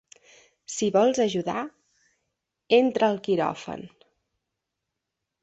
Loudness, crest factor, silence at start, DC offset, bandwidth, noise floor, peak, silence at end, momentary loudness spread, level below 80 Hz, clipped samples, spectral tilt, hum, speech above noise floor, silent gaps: -24 LUFS; 22 dB; 0.7 s; under 0.1%; 8.2 kHz; -84 dBFS; -6 dBFS; 1.55 s; 16 LU; -68 dBFS; under 0.1%; -4.5 dB/octave; none; 60 dB; none